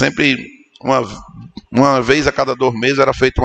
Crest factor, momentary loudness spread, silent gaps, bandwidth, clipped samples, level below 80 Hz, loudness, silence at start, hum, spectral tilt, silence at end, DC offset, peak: 16 dB; 15 LU; none; 8.6 kHz; under 0.1%; -34 dBFS; -15 LUFS; 0 s; none; -5 dB/octave; 0 s; under 0.1%; 0 dBFS